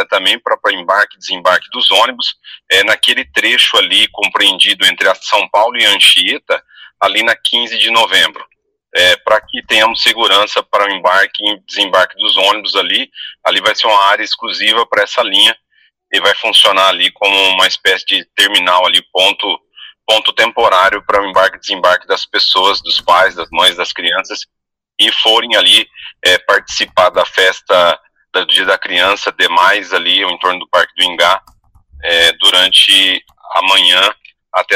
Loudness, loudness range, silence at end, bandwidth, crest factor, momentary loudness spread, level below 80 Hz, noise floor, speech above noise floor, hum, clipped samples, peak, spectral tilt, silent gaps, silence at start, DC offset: -10 LUFS; 3 LU; 0 s; 16 kHz; 12 dB; 8 LU; -52 dBFS; -52 dBFS; 41 dB; none; under 0.1%; 0 dBFS; 0 dB/octave; none; 0 s; under 0.1%